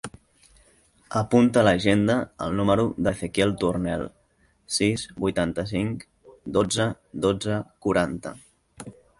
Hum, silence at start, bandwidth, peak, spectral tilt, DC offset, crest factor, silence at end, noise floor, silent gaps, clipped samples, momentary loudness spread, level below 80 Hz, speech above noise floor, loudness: none; 0.05 s; 11.5 kHz; -6 dBFS; -5.5 dB/octave; under 0.1%; 20 dB; 0.3 s; -64 dBFS; none; under 0.1%; 17 LU; -48 dBFS; 40 dB; -24 LUFS